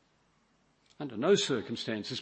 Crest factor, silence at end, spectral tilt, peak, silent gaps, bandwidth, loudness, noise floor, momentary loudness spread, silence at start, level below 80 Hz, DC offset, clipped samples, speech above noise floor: 20 dB; 0 s; -4 dB/octave; -14 dBFS; none; 8.6 kHz; -31 LUFS; -70 dBFS; 14 LU; 1 s; -76 dBFS; under 0.1%; under 0.1%; 39 dB